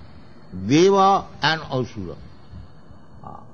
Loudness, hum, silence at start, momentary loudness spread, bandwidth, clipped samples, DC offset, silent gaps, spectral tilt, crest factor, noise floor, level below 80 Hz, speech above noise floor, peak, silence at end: -19 LUFS; none; 0.5 s; 26 LU; 7 kHz; under 0.1%; 0.8%; none; -5 dB/octave; 18 dB; -47 dBFS; -50 dBFS; 28 dB; -4 dBFS; 0.15 s